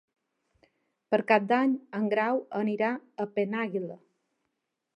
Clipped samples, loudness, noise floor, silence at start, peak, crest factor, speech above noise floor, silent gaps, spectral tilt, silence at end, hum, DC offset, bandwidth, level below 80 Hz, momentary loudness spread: under 0.1%; -28 LUFS; -82 dBFS; 1.1 s; -8 dBFS; 22 dB; 54 dB; none; -8 dB/octave; 1 s; none; under 0.1%; 8.2 kHz; -84 dBFS; 9 LU